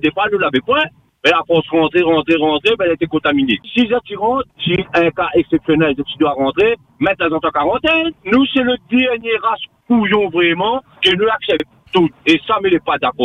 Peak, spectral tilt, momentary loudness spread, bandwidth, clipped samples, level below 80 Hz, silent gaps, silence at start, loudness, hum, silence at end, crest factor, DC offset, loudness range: 0 dBFS; -6 dB/octave; 5 LU; 9 kHz; under 0.1%; -48 dBFS; none; 0.05 s; -15 LUFS; none; 0 s; 14 dB; under 0.1%; 1 LU